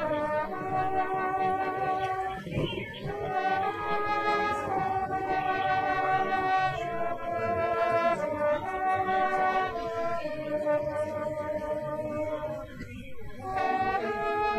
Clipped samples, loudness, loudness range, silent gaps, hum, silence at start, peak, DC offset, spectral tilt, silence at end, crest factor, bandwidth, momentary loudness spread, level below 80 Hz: under 0.1%; -29 LUFS; 4 LU; none; none; 0 s; -14 dBFS; under 0.1%; -6 dB/octave; 0 s; 16 dB; 13 kHz; 7 LU; -54 dBFS